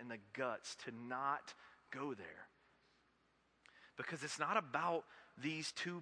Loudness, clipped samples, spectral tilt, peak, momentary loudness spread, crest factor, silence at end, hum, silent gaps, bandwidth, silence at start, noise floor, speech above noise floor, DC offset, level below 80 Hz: -43 LUFS; under 0.1%; -3.5 dB/octave; -20 dBFS; 19 LU; 26 dB; 0 s; none; none; 10.5 kHz; 0 s; -77 dBFS; 33 dB; under 0.1%; -88 dBFS